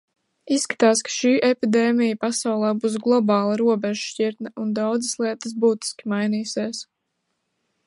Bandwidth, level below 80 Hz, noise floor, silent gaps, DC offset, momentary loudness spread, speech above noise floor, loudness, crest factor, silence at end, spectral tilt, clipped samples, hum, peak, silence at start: 11.5 kHz; -74 dBFS; -76 dBFS; none; under 0.1%; 8 LU; 55 dB; -22 LUFS; 18 dB; 1.05 s; -4 dB/octave; under 0.1%; none; -4 dBFS; 0.45 s